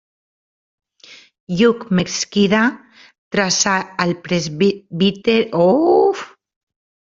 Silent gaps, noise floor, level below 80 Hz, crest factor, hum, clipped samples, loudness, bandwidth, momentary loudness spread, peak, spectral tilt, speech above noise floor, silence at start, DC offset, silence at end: 1.40-1.47 s, 3.18-3.31 s; -45 dBFS; -56 dBFS; 18 dB; none; under 0.1%; -17 LUFS; 7.6 kHz; 7 LU; 0 dBFS; -4.5 dB/octave; 29 dB; 1.1 s; under 0.1%; 0.9 s